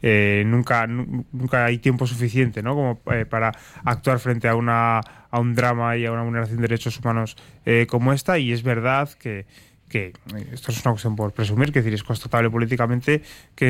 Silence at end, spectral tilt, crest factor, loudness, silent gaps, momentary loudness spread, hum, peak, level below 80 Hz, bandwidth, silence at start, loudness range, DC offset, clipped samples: 0 s; -7 dB/octave; 16 dB; -22 LUFS; none; 9 LU; none; -6 dBFS; -50 dBFS; 15.5 kHz; 0 s; 3 LU; under 0.1%; under 0.1%